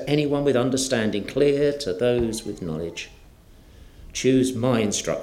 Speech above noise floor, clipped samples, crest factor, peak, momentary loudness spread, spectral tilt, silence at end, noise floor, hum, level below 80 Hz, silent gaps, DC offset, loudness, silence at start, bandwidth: 27 dB; under 0.1%; 16 dB; -6 dBFS; 11 LU; -5 dB/octave; 0 s; -49 dBFS; none; -48 dBFS; none; under 0.1%; -23 LUFS; 0 s; 15.5 kHz